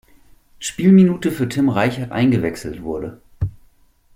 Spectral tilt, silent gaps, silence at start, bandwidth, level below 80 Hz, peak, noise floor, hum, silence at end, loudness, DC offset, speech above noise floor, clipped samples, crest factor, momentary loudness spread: -6.5 dB/octave; none; 0.6 s; 15.5 kHz; -44 dBFS; -2 dBFS; -54 dBFS; none; 0.65 s; -18 LUFS; under 0.1%; 37 dB; under 0.1%; 16 dB; 16 LU